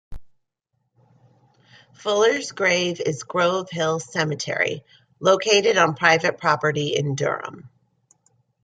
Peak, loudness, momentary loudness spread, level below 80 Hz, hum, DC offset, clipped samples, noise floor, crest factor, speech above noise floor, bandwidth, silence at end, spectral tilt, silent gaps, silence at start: -2 dBFS; -21 LUFS; 8 LU; -54 dBFS; none; under 0.1%; under 0.1%; -75 dBFS; 20 dB; 53 dB; 9.4 kHz; 0.95 s; -3.5 dB/octave; none; 0.1 s